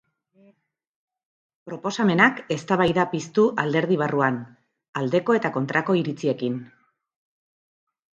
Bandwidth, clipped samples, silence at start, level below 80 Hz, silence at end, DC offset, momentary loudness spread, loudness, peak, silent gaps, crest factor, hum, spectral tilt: 8.8 kHz; under 0.1%; 1.65 s; -62 dBFS; 1.55 s; under 0.1%; 11 LU; -22 LUFS; -2 dBFS; 4.89-4.93 s; 22 dB; none; -6 dB/octave